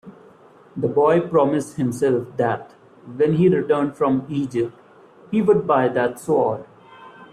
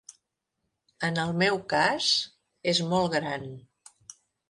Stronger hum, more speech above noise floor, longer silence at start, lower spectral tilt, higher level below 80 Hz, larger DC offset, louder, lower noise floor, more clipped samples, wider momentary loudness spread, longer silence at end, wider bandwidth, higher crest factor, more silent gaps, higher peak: neither; second, 29 dB vs 55 dB; about the same, 0.05 s vs 0.1 s; first, -7.5 dB/octave vs -4 dB/octave; first, -60 dBFS vs -66 dBFS; neither; first, -20 LUFS vs -26 LUFS; second, -49 dBFS vs -81 dBFS; neither; second, 9 LU vs 13 LU; second, 0.05 s vs 0.4 s; first, 13.5 kHz vs 11.5 kHz; about the same, 16 dB vs 20 dB; neither; first, -4 dBFS vs -10 dBFS